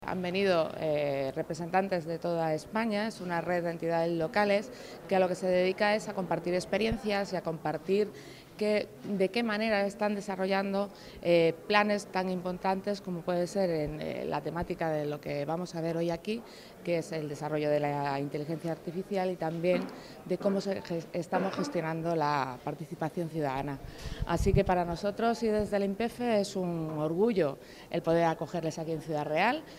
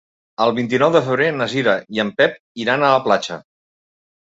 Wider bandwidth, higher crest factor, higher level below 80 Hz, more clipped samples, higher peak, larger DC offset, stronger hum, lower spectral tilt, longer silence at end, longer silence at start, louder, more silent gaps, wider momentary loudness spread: first, 16 kHz vs 8 kHz; about the same, 20 dB vs 18 dB; first, -52 dBFS vs -62 dBFS; neither; second, -10 dBFS vs 0 dBFS; neither; neither; about the same, -6 dB/octave vs -5.5 dB/octave; second, 0 s vs 0.95 s; second, 0 s vs 0.4 s; second, -31 LUFS vs -17 LUFS; second, none vs 2.39-2.55 s; about the same, 8 LU vs 9 LU